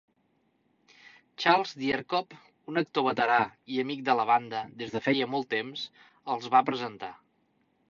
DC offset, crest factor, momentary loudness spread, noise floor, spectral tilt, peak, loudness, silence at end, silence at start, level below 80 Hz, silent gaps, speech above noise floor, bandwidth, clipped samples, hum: under 0.1%; 24 dB; 14 LU; -72 dBFS; -5 dB/octave; -6 dBFS; -28 LUFS; 0.75 s; 1.05 s; -74 dBFS; none; 43 dB; 7.4 kHz; under 0.1%; none